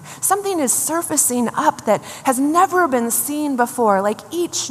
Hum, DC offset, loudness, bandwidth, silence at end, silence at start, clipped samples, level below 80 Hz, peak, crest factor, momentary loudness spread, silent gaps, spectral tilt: none; under 0.1%; -18 LUFS; 15 kHz; 0 s; 0 s; under 0.1%; -66 dBFS; -2 dBFS; 16 dB; 5 LU; none; -2.5 dB/octave